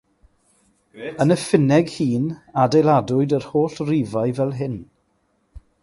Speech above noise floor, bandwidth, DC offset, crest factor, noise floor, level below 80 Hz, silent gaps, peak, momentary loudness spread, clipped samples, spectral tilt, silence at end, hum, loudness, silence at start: 47 dB; 11.5 kHz; under 0.1%; 18 dB; -66 dBFS; -54 dBFS; none; -2 dBFS; 12 LU; under 0.1%; -7 dB/octave; 0.25 s; none; -20 LUFS; 0.95 s